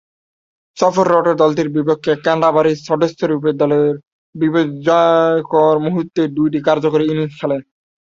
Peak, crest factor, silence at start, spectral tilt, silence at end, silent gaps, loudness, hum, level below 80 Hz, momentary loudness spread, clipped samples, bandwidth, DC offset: 0 dBFS; 14 dB; 0.75 s; -7 dB/octave; 0.4 s; 4.07-4.33 s; -15 LUFS; none; -58 dBFS; 6 LU; under 0.1%; 7.6 kHz; under 0.1%